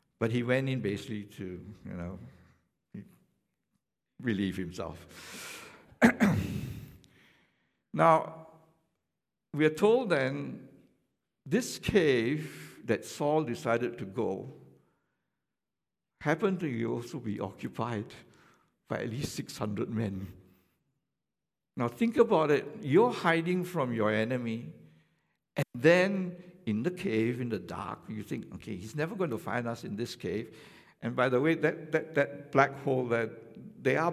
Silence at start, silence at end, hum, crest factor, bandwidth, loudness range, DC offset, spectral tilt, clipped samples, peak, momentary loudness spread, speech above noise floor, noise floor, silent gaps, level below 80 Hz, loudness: 0.2 s; 0 s; none; 24 dB; 15.5 kHz; 9 LU; under 0.1%; -6.5 dB/octave; under 0.1%; -8 dBFS; 18 LU; over 60 dB; under -90 dBFS; none; -60 dBFS; -31 LUFS